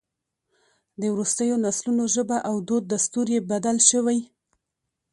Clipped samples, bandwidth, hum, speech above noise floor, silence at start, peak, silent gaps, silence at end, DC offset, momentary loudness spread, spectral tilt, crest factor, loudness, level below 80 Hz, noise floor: under 0.1%; 11.5 kHz; none; 59 dB; 1 s; -2 dBFS; none; 0.85 s; under 0.1%; 9 LU; -3.5 dB/octave; 24 dB; -22 LUFS; -68 dBFS; -82 dBFS